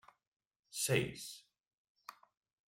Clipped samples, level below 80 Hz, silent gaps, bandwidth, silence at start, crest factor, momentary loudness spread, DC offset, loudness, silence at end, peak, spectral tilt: under 0.1%; -72 dBFS; 1.60-1.95 s; 16.5 kHz; 0.7 s; 24 dB; 22 LU; under 0.1%; -38 LUFS; 0.55 s; -20 dBFS; -3.5 dB/octave